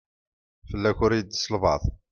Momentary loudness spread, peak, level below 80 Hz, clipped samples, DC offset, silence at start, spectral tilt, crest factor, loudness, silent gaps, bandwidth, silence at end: 5 LU; -8 dBFS; -40 dBFS; under 0.1%; under 0.1%; 0.65 s; -5.5 dB/octave; 18 dB; -25 LUFS; none; 7.2 kHz; 0.15 s